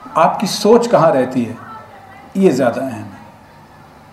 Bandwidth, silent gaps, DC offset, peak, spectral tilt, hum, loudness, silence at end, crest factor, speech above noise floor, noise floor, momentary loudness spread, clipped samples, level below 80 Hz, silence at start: 15 kHz; none; under 0.1%; 0 dBFS; -5.5 dB/octave; none; -14 LUFS; 0.9 s; 16 dB; 28 dB; -42 dBFS; 21 LU; under 0.1%; -56 dBFS; 0 s